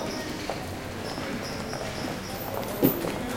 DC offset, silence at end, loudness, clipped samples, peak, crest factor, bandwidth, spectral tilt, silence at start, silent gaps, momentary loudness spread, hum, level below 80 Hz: under 0.1%; 0 s; -31 LUFS; under 0.1%; -6 dBFS; 24 dB; 17 kHz; -5 dB/octave; 0 s; none; 9 LU; none; -48 dBFS